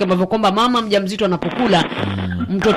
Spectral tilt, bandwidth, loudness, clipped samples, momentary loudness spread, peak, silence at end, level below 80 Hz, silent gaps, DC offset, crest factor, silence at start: -6 dB/octave; 13 kHz; -17 LUFS; under 0.1%; 7 LU; -2 dBFS; 0 s; -44 dBFS; none; under 0.1%; 14 dB; 0 s